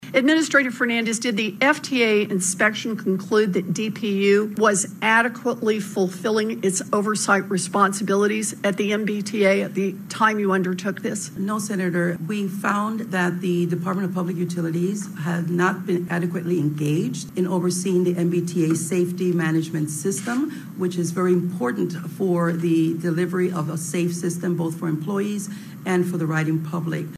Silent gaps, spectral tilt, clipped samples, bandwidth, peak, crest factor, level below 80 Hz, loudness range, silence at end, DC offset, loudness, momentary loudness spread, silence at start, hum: none; -5 dB/octave; under 0.1%; 15.5 kHz; -4 dBFS; 18 dB; -70 dBFS; 3 LU; 0 s; under 0.1%; -22 LUFS; 7 LU; 0 s; none